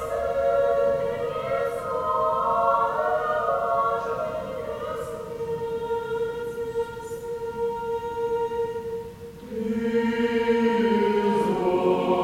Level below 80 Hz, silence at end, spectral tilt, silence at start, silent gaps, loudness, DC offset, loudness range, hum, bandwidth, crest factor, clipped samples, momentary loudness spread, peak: -52 dBFS; 0 s; -6.5 dB/octave; 0 s; none; -25 LUFS; under 0.1%; 6 LU; none; 16.5 kHz; 16 dB; under 0.1%; 10 LU; -10 dBFS